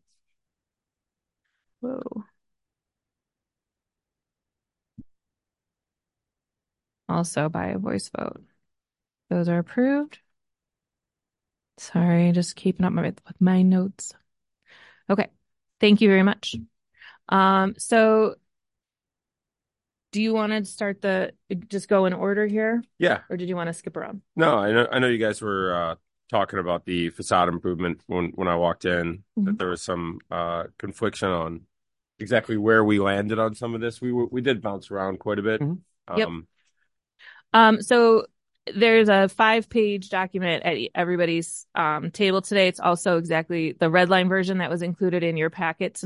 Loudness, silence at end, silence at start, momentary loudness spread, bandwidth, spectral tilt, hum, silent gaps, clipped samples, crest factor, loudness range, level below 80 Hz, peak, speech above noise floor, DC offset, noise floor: -23 LUFS; 0 s; 1.8 s; 13 LU; 11.5 kHz; -5.5 dB/octave; none; none; under 0.1%; 20 dB; 10 LU; -56 dBFS; -4 dBFS; 67 dB; under 0.1%; -90 dBFS